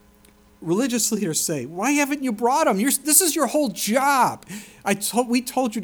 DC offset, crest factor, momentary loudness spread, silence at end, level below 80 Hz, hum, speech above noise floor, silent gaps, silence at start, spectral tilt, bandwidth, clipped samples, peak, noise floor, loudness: under 0.1%; 20 dB; 10 LU; 0 s; -62 dBFS; none; 32 dB; none; 0.6 s; -3 dB/octave; over 20 kHz; under 0.1%; -2 dBFS; -53 dBFS; -20 LUFS